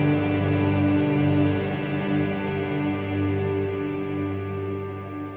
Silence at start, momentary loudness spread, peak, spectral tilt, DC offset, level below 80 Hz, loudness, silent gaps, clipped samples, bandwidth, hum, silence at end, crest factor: 0 s; 8 LU; -10 dBFS; -10 dB/octave; under 0.1%; -54 dBFS; -25 LUFS; none; under 0.1%; 4.4 kHz; 50 Hz at -50 dBFS; 0 s; 14 dB